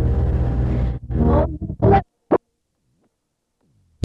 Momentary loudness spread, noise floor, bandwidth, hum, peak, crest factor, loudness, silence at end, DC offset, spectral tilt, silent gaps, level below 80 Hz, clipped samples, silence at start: 7 LU; -74 dBFS; 4.9 kHz; none; -6 dBFS; 14 dB; -20 LUFS; 1.7 s; under 0.1%; -11 dB/octave; none; -26 dBFS; under 0.1%; 0 s